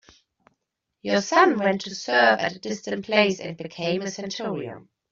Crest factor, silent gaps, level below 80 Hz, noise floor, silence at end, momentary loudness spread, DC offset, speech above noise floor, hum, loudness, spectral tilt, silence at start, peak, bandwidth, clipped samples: 20 dB; none; -68 dBFS; -79 dBFS; 0.35 s; 14 LU; under 0.1%; 55 dB; none; -23 LUFS; -4 dB/octave; 1.05 s; -4 dBFS; 7.6 kHz; under 0.1%